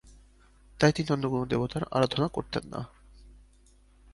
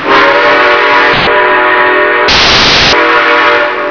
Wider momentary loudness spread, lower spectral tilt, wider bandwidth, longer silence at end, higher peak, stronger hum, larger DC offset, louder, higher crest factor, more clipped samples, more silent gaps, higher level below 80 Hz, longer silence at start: first, 13 LU vs 3 LU; first, -6 dB/octave vs -3 dB/octave; first, 11.5 kHz vs 5.4 kHz; first, 0.8 s vs 0 s; second, -6 dBFS vs 0 dBFS; neither; neither; second, -29 LUFS vs -5 LUFS; first, 24 dB vs 6 dB; second, under 0.1% vs 3%; neither; second, -54 dBFS vs -30 dBFS; about the same, 0.05 s vs 0 s